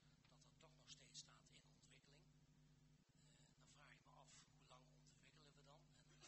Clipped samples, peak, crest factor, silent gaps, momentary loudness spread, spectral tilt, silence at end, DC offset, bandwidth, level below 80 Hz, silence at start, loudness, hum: under 0.1%; -46 dBFS; 24 dB; none; 8 LU; -2.5 dB/octave; 0 s; under 0.1%; 8.2 kHz; -84 dBFS; 0 s; -65 LUFS; none